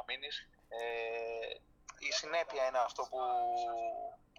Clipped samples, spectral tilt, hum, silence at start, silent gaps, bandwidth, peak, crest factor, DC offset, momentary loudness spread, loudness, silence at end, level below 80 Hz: under 0.1%; -0.5 dB/octave; none; 0 s; none; 10 kHz; -22 dBFS; 16 dB; under 0.1%; 11 LU; -38 LUFS; 0.25 s; -70 dBFS